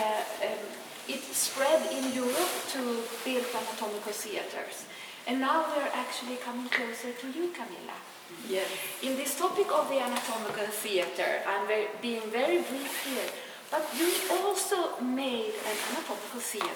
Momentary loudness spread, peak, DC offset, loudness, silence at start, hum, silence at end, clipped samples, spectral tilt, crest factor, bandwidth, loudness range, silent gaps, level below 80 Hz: 10 LU; -10 dBFS; under 0.1%; -31 LUFS; 0 s; none; 0 s; under 0.1%; -1.5 dB/octave; 20 dB; over 20 kHz; 3 LU; none; -86 dBFS